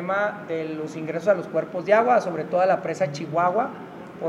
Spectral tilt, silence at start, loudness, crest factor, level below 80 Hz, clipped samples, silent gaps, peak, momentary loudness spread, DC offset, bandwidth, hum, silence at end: -6.5 dB/octave; 0 s; -24 LUFS; 18 dB; -70 dBFS; under 0.1%; none; -4 dBFS; 11 LU; under 0.1%; 11 kHz; none; 0 s